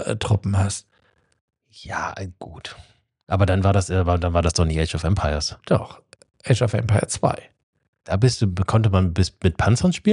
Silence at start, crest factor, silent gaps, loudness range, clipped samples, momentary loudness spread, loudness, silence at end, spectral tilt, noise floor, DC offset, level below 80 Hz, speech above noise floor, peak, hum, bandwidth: 0 s; 18 dB; 1.41-1.48 s, 7.63-7.73 s, 7.88-7.93 s; 5 LU; under 0.1%; 14 LU; -21 LUFS; 0 s; -6 dB/octave; -63 dBFS; under 0.1%; -36 dBFS; 43 dB; -4 dBFS; none; 11 kHz